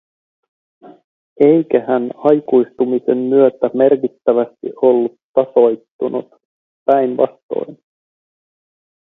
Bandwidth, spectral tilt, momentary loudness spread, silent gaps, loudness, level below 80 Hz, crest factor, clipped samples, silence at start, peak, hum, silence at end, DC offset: 4 kHz; -10 dB/octave; 11 LU; 1.04-1.36 s, 5.23-5.34 s, 5.91-5.99 s, 6.45-6.86 s, 7.43-7.49 s; -15 LUFS; -66 dBFS; 16 dB; under 0.1%; 0.85 s; 0 dBFS; none; 1.3 s; under 0.1%